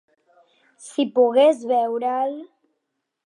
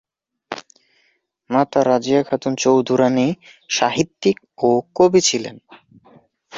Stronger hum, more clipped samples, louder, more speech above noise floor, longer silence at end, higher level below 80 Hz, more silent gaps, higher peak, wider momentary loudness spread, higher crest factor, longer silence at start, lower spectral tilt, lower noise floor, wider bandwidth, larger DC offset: neither; neither; about the same, -20 LUFS vs -18 LUFS; first, 59 dB vs 47 dB; first, 0.8 s vs 0 s; second, -84 dBFS vs -60 dBFS; neither; second, -6 dBFS vs -2 dBFS; second, 13 LU vs 17 LU; about the same, 16 dB vs 16 dB; first, 0.8 s vs 0.5 s; about the same, -4 dB/octave vs -4.5 dB/octave; first, -78 dBFS vs -64 dBFS; first, 11 kHz vs 7.8 kHz; neither